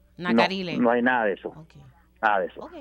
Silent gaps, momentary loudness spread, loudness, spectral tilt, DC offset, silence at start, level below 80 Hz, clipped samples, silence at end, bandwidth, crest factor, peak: none; 12 LU; -24 LUFS; -6 dB/octave; under 0.1%; 0.2 s; -60 dBFS; under 0.1%; 0 s; 8.8 kHz; 18 dB; -6 dBFS